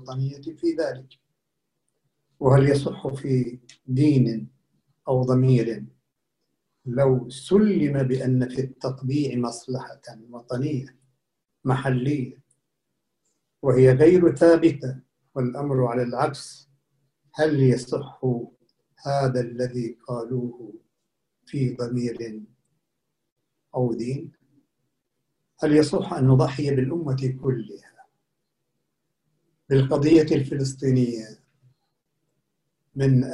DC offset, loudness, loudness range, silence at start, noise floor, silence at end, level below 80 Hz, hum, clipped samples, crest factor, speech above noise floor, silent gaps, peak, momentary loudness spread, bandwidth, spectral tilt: under 0.1%; -23 LUFS; 10 LU; 0 s; -80 dBFS; 0 s; -56 dBFS; none; under 0.1%; 20 dB; 58 dB; 23.32-23.36 s; -4 dBFS; 18 LU; 11 kHz; -8 dB/octave